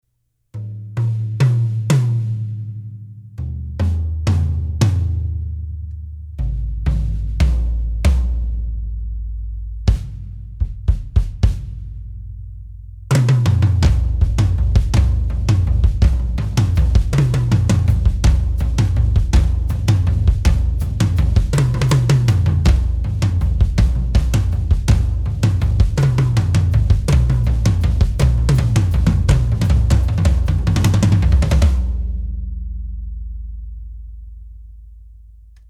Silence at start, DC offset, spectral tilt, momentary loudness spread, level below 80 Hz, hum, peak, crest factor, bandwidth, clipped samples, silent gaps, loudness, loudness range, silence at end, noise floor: 0.55 s; under 0.1%; -7 dB/octave; 16 LU; -20 dBFS; none; -2 dBFS; 14 dB; 13 kHz; under 0.1%; none; -18 LUFS; 7 LU; 0.45 s; -68 dBFS